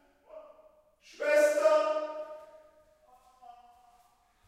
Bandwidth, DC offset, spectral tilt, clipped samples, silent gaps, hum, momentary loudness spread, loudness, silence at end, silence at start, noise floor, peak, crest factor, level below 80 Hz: 15.5 kHz; under 0.1%; -1 dB/octave; under 0.1%; none; none; 27 LU; -27 LUFS; 2 s; 0.35 s; -66 dBFS; -14 dBFS; 18 dB; -78 dBFS